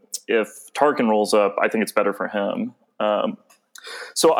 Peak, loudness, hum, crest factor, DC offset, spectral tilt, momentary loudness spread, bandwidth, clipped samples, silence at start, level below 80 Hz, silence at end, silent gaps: -4 dBFS; -22 LUFS; none; 18 dB; under 0.1%; -3.5 dB/octave; 15 LU; 18 kHz; under 0.1%; 0.15 s; -78 dBFS; 0 s; none